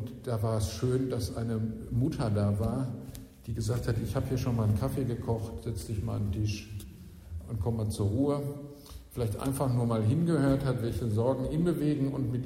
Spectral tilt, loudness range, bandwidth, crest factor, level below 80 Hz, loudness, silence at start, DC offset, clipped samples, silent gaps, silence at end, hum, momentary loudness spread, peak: -7.5 dB/octave; 5 LU; 16 kHz; 16 dB; -46 dBFS; -31 LUFS; 0 s; under 0.1%; under 0.1%; none; 0 s; none; 14 LU; -14 dBFS